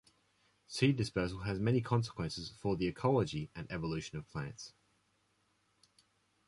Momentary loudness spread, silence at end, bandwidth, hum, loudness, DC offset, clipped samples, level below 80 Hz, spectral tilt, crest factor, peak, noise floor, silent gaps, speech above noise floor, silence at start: 12 LU; 1.8 s; 11.5 kHz; none; -36 LUFS; under 0.1%; under 0.1%; -58 dBFS; -6.5 dB/octave; 20 dB; -18 dBFS; -76 dBFS; none; 41 dB; 0.7 s